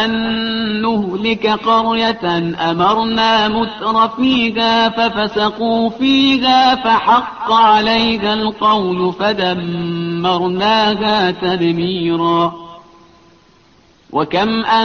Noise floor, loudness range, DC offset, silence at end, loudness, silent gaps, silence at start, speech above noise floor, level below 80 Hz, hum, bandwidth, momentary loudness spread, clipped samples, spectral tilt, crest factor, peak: -50 dBFS; 4 LU; under 0.1%; 0 s; -14 LUFS; none; 0 s; 35 dB; -46 dBFS; none; 6.8 kHz; 6 LU; under 0.1%; -5.5 dB/octave; 14 dB; -2 dBFS